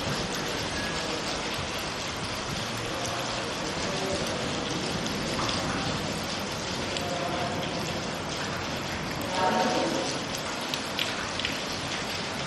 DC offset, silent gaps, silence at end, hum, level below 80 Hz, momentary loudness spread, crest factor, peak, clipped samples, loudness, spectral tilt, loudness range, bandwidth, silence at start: under 0.1%; none; 0 s; none; -50 dBFS; 4 LU; 22 dB; -8 dBFS; under 0.1%; -29 LUFS; -3.5 dB/octave; 2 LU; 14 kHz; 0 s